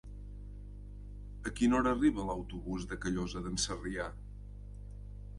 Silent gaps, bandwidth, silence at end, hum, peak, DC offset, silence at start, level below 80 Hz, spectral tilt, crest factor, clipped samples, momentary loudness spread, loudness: none; 11.5 kHz; 0 s; 50 Hz at -45 dBFS; -18 dBFS; under 0.1%; 0.05 s; -46 dBFS; -4.5 dB/octave; 18 dB; under 0.1%; 20 LU; -34 LUFS